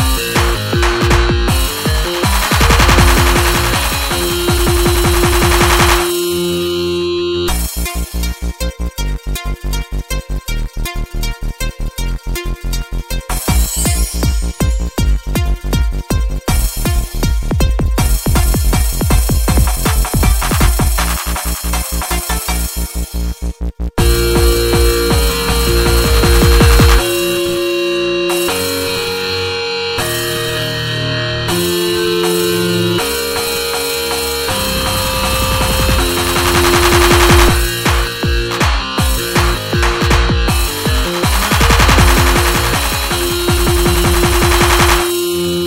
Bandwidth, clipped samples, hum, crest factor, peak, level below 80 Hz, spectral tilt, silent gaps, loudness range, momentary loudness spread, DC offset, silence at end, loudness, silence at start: 16.5 kHz; under 0.1%; none; 14 dB; 0 dBFS; -18 dBFS; -4 dB/octave; none; 7 LU; 12 LU; 0.1%; 0 s; -14 LUFS; 0 s